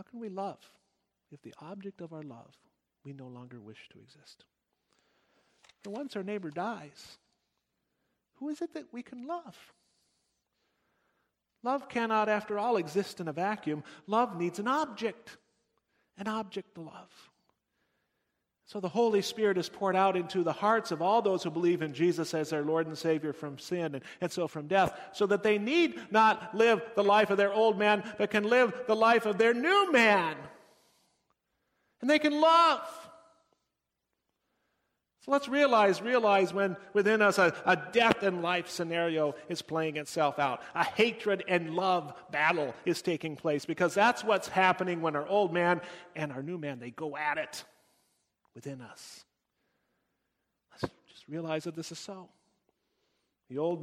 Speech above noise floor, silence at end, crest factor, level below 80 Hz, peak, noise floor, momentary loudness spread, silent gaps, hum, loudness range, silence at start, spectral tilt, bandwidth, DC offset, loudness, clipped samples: 55 dB; 0 s; 24 dB; -74 dBFS; -8 dBFS; -85 dBFS; 19 LU; none; none; 18 LU; 0.15 s; -5 dB/octave; 16 kHz; under 0.1%; -29 LUFS; under 0.1%